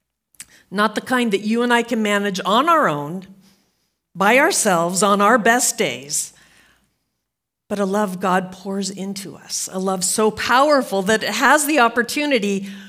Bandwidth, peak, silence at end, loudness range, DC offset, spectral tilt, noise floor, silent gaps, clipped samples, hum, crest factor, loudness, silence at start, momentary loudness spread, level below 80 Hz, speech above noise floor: 16 kHz; 0 dBFS; 0 s; 7 LU; under 0.1%; -3 dB/octave; -80 dBFS; none; under 0.1%; none; 18 dB; -18 LUFS; 0.7 s; 12 LU; -64 dBFS; 62 dB